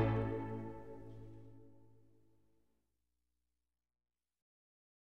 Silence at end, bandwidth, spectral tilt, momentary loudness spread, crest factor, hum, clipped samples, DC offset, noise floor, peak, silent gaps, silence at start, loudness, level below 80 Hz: 0.65 s; 4.7 kHz; -9.5 dB/octave; 22 LU; 24 dB; 60 Hz at -85 dBFS; under 0.1%; under 0.1%; under -90 dBFS; -22 dBFS; none; 0 s; -43 LUFS; -60 dBFS